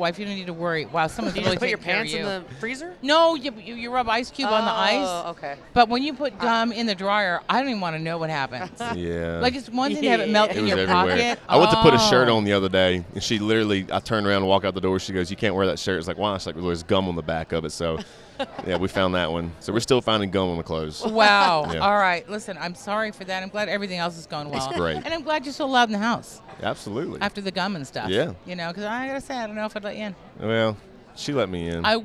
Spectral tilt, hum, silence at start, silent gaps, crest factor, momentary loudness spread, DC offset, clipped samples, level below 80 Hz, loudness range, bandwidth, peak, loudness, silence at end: -4.5 dB/octave; none; 0 s; none; 24 dB; 12 LU; under 0.1%; under 0.1%; -50 dBFS; 9 LU; 13.5 kHz; 0 dBFS; -23 LUFS; 0 s